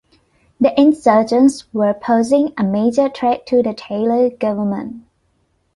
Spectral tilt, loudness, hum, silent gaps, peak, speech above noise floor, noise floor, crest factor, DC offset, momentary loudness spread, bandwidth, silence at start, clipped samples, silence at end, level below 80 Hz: -6.5 dB/octave; -16 LUFS; none; none; -2 dBFS; 48 dB; -63 dBFS; 14 dB; under 0.1%; 8 LU; 11.5 kHz; 0.6 s; under 0.1%; 0.75 s; -56 dBFS